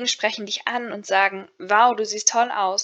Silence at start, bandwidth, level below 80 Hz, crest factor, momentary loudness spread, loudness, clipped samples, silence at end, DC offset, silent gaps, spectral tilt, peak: 0 s; 8.6 kHz; -84 dBFS; 20 dB; 9 LU; -21 LUFS; under 0.1%; 0 s; under 0.1%; none; -0.5 dB/octave; -2 dBFS